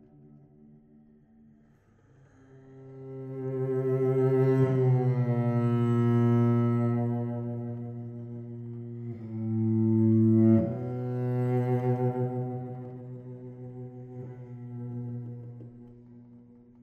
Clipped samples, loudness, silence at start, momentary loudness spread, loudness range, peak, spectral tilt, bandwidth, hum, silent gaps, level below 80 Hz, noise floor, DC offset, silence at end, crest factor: under 0.1%; -27 LUFS; 0.35 s; 19 LU; 16 LU; -12 dBFS; -11.5 dB/octave; 3.3 kHz; none; none; -68 dBFS; -61 dBFS; under 0.1%; 0.45 s; 16 dB